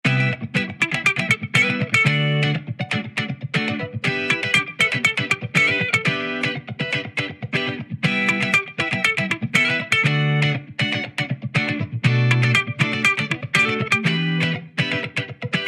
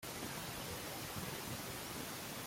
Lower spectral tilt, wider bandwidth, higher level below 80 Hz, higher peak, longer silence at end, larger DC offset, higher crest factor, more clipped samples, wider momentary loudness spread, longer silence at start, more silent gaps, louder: first, -5 dB/octave vs -3 dB/octave; second, 14.5 kHz vs 16.5 kHz; about the same, -64 dBFS vs -64 dBFS; first, -2 dBFS vs -30 dBFS; about the same, 0 s vs 0 s; neither; about the same, 18 dB vs 14 dB; neither; first, 8 LU vs 1 LU; about the same, 0.05 s vs 0 s; neither; first, -20 LUFS vs -44 LUFS